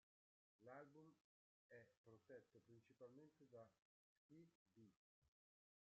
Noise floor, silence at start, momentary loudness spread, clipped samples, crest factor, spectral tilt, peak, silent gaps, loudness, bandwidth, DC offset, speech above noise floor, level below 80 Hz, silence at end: under -90 dBFS; 0.6 s; 5 LU; under 0.1%; 20 dB; -6.5 dB/octave; -50 dBFS; 1.21-1.69 s, 1.97-2.04 s, 3.82-4.29 s, 4.55-4.66 s, 4.96-5.22 s; -67 LUFS; 6.8 kHz; under 0.1%; over 21 dB; under -90 dBFS; 0.6 s